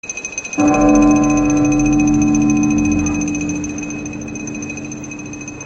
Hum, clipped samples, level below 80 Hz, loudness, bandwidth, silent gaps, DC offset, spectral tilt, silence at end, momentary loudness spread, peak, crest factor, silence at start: none; under 0.1%; -34 dBFS; -16 LUFS; 8.2 kHz; none; under 0.1%; -5.5 dB/octave; 0 s; 15 LU; 0 dBFS; 14 dB; 0.05 s